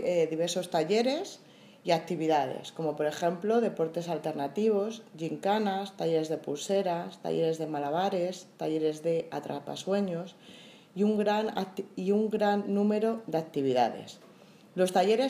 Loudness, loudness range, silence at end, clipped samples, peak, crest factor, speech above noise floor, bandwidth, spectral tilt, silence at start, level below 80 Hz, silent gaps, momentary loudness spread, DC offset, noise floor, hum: -30 LUFS; 3 LU; 0 s; under 0.1%; -12 dBFS; 18 dB; 26 dB; 15.5 kHz; -5.5 dB/octave; 0 s; -84 dBFS; none; 10 LU; under 0.1%; -55 dBFS; none